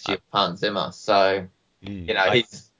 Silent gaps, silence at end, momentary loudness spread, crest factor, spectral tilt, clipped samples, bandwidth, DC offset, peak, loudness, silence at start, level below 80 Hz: none; 0.2 s; 14 LU; 18 dB; -4.5 dB/octave; under 0.1%; 7.6 kHz; under 0.1%; -4 dBFS; -22 LUFS; 0 s; -54 dBFS